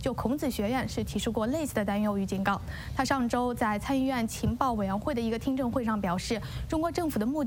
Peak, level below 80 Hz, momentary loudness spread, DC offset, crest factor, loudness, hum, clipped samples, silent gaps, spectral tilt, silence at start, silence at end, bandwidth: -10 dBFS; -44 dBFS; 3 LU; under 0.1%; 20 dB; -30 LUFS; none; under 0.1%; none; -5.5 dB/octave; 0 s; 0 s; 16.5 kHz